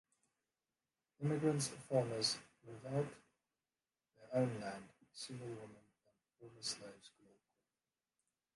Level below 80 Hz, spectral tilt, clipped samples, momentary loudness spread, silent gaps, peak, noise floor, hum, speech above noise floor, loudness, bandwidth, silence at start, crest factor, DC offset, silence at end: -80 dBFS; -4.5 dB/octave; under 0.1%; 20 LU; none; -24 dBFS; under -90 dBFS; none; over 49 dB; -41 LUFS; 11.5 kHz; 1.2 s; 22 dB; under 0.1%; 1.5 s